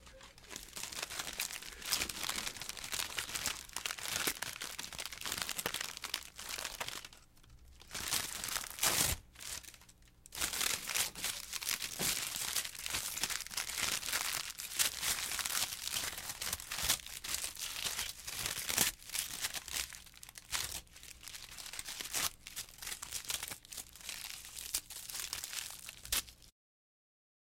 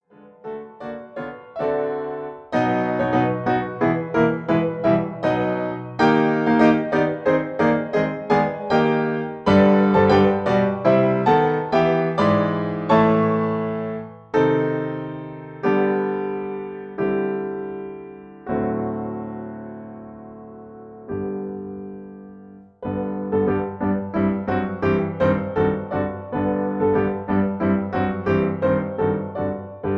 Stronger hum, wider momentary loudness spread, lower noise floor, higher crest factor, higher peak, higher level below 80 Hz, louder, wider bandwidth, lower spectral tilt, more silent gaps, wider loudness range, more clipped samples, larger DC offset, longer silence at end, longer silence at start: neither; second, 12 LU vs 17 LU; first, -61 dBFS vs -44 dBFS; first, 30 dB vs 18 dB; second, -12 dBFS vs -2 dBFS; second, -60 dBFS vs -52 dBFS; second, -37 LUFS vs -21 LUFS; first, 17 kHz vs 7.4 kHz; second, 0 dB/octave vs -8.5 dB/octave; neither; second, 6 LU vs 12 LU; neither; neither; first, 1 s vs 0 s; second, 0 s vs 0.25 s